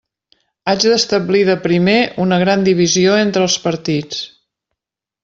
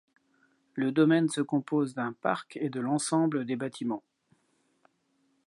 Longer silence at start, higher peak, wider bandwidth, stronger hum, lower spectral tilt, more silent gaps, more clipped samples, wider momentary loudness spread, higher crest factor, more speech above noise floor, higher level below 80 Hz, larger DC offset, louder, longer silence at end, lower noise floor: about the same, 0.65 s vs 0.75 s; first, -2 dBFS vs -10 dBFS; second, 7.8 kHz vs 11.5 kHz; neither; about the same, -4.5 dB/octave vs -5.5 dB/octave; neither; neither; second, 8 LU vs 11 LU; second, 14 dB vs 20 dB; first, 68 dB vs 44 dB; first, -54 dBFS vs -82 dBFS; neither; first, -14 LUFS vs -29 LUFS; second, 0.95 s vs 1.45 s; first, -82 dBFS vs -73 dBFS